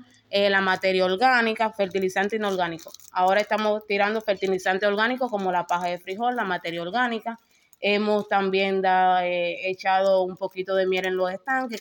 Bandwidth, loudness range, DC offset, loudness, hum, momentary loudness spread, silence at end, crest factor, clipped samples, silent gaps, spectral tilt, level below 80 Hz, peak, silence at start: 17 kHz; 3 LU; under 0.1%; -24 LUFS; none; 7 LU; 0 s; 16 dB; under 0.1%; none; -5 dB/octave; -72 dBFS; -8 dBFS; 0.3 s